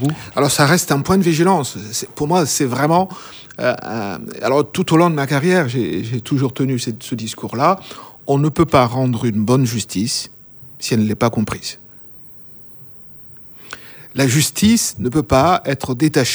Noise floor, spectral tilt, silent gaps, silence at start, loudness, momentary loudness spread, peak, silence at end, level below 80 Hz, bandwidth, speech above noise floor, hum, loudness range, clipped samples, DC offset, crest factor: -40 dBFS; -5 dB/octave; none; 0 s; -17 LUFS; 22 LU; 0 dBFS; 0 s; -46 dBFS; over 20 kHz; 23 dB; none; 6 LU; under 0.1%; under 0.1%; 18 dB